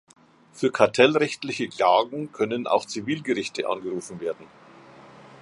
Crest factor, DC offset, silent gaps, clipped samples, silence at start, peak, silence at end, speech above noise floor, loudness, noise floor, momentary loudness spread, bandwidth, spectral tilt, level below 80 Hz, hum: 24 dB; under 0.1%; none; under 0.1%; 0.55 s; -2 dBFS; 0.15 s; 24 dB; -24 LUFS; -48 dBFS; 13 LU; 11.5 kHz; -4.5 dB/octave; -68 dBFS; none